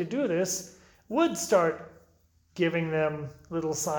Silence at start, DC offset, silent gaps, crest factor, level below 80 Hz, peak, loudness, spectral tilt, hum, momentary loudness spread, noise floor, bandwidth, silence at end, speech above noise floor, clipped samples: 0 s; under 0.1%; none; 20 dB; -64 dBFS; -10 dBFS; -28 LUFS; -4.5 dB/octave; none; 14 LU; -65 dBFS; 19 kHz; 0 s; 37 dB; under 0.1%